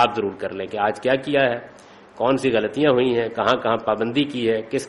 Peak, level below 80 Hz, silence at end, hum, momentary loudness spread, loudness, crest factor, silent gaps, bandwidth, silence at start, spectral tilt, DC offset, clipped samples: -4 dBFS; -58 dBFS; 0 s; none; 7 LU; -21 LUFS; 16 dB; none; 11.5 kHz; 0 s; -5.5 dB/octave; under 0.1%; under 0.1%